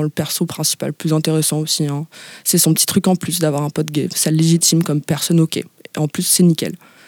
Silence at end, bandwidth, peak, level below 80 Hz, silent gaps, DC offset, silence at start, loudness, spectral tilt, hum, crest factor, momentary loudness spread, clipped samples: 0.3 s; 19 kHz; -2 dBFS; -60 dBFS; none; under 0.1%; 0 s; -16 LUFS; -4.5 dB/octave; none; 14 dB; 9 LU; under 0.1%